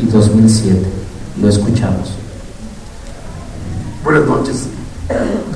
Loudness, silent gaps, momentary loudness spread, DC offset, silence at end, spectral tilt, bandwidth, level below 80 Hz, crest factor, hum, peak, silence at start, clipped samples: -14 LUFS; none; 21 LU; under 0.1%; 0 s; -6.5 dB/octave; 11 kHz; -30 dBFS; 14 dB; none; 0 dBFS; 0 s; under 0.1%